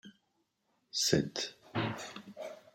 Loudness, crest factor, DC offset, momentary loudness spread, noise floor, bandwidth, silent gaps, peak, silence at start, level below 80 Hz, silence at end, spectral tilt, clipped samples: -34 LUFS; 26 dB; under 0.1%; 17 LU; -79 dBFS; 16.5 kHz; none; -12 dBFS; 0.05 s; -68 dBFS; 0.15 s; -3.5 dB/octave; under 0.1%